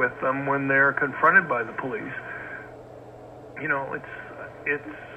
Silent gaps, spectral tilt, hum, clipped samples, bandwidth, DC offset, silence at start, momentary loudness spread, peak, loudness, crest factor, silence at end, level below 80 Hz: none; -7.5 dB/octave; none; under 0.1%; 8.6 kHz; under 0.1%; 0 s; 24 LU; -6 dBFS; -24 LUFS; 20 dB; 0 s; -62 dBFS